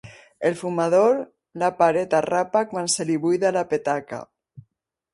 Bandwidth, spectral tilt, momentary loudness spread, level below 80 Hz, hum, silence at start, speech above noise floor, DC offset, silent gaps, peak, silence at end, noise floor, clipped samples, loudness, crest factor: 11.5 kHz; -4.5 dB/octave; 8 LU; -66 dBFS; none; 0.05 s; 50 dB; under 0.1%; none; -4 dBFS; 0.55 s; -72 dBFS; under 0.1%; -22 LUFS; 18 dB